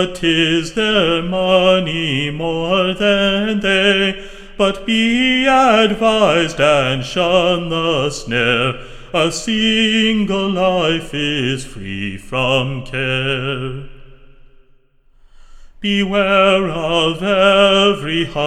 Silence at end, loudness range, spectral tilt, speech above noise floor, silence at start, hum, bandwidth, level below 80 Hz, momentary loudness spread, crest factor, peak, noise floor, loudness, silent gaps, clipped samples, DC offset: 0 s; 7 LU; -4.5 dB/octave; 35 dB; 0 s; none; 13 kHz; -38 dBFS; 9 LU; 16 dB; 0 dBFS; -51 dBFS; -15 LUFS; none; under 0.1%; under 0.1%